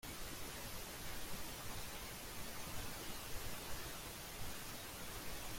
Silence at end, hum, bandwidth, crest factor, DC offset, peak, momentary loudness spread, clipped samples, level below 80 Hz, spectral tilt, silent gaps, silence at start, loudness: 0 s; none; 16.5 kHz; 16 dB; under 0.1%; -32 dBFS; 1 LU; under 0.1%; -56 dBFS; -2.5 dB/octave; none; 0.05 s; -48 LUFS